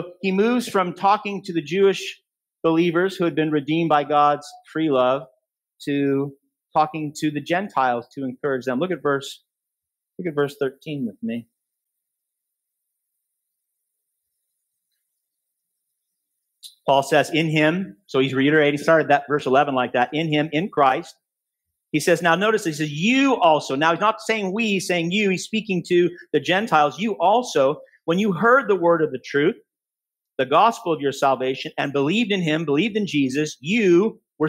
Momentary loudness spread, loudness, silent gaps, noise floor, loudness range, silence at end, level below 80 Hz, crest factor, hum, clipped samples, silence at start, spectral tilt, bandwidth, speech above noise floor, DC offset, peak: 10 LU; -21 LUFS; none; -89 dBFS; 8 LU; 0 s; -72 dBFS; 18 dB; none; under 0.1%; 0 s; -5.5 dB/octave; 16 kHz; 68 dB; under 0.1%; -2 dBFS